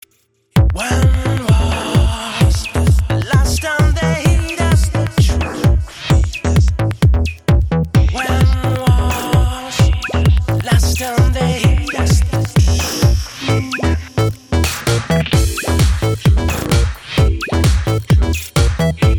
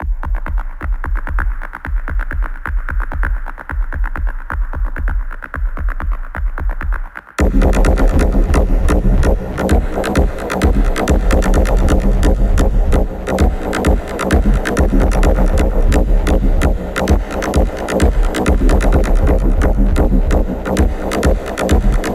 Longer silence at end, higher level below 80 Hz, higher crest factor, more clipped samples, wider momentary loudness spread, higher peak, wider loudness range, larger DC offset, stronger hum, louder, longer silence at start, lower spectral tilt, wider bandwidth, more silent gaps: about the same, 0 s vs 0 s; about the same, -18 dBFS vs -14 dBFS; about the same, 12 dB vs 12 dB; neither; second, 3 LU vs 9 LU; about the same, -2 dBFS vs 0 dBFS; second, 1 LU vs 8 LU; neither; neither; about the same, -15 LUFS vs -17 LUFS; first, 0.55 s vs 0 s; about the same, -5.5 dB/octave vs -6.5 dB/octave; first, 18.5 kHz vs 13.5 kHz; neither